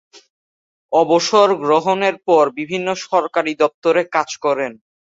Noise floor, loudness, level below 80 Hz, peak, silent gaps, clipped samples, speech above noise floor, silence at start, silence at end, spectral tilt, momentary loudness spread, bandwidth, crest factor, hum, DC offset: under -90 dBFS; -17 LUFS; -66 dBFS; -2 dBFS; 3.74-3.82 s; under 0.1%; over 74 dB; 0.9 s; 0.3 s; -4 dB/octave; 8 LU; 8 kHz; 16 dB; none; under 0.1%